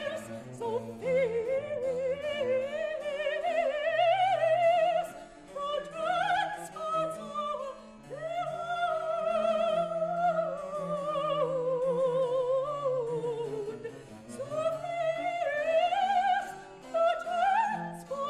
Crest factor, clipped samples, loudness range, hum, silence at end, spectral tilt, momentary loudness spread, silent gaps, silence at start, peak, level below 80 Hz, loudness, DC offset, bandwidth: 12 dB; under 0.1%; 5 LU; none; 0 s; -4.5 dB/octave; 11 LU; none; 0 s; -18 dBFS; -66 dBFS; -30 LUFS; under 0.1%; 13 kHz